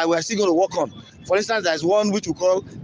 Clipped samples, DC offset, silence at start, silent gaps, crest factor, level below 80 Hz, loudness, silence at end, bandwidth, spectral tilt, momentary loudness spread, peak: under 0.1%; under 0.1%; 0 s; none; 14 dB; -58 dBFS; -21 LUFS; 0 s; 10 kHz; -4 dB/octave; 6 LU; -8 dBFS